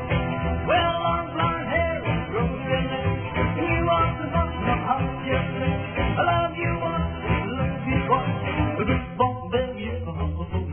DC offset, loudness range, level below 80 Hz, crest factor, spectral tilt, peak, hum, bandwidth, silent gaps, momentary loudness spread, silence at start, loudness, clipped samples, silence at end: under 0.1%; 1 LU; -36 dBFS; 16 dB; -10.5 dB/octave; -8 dBFS; none; 3.5 kHz; none; 5 LU; 0 s; -25 LUFS; under 0.1%; 0 s